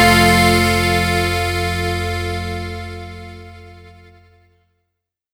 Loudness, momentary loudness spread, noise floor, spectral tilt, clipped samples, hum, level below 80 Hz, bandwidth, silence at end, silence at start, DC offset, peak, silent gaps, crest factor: -16 LUFS; 22 LU; -77 dBFS; -4.5 dB/octave; under 0.1%; none; -34 dBFS; over 20 kHz; 1.45 s; 0 s; under 0.1%; 0 dBFS; none; 18 dB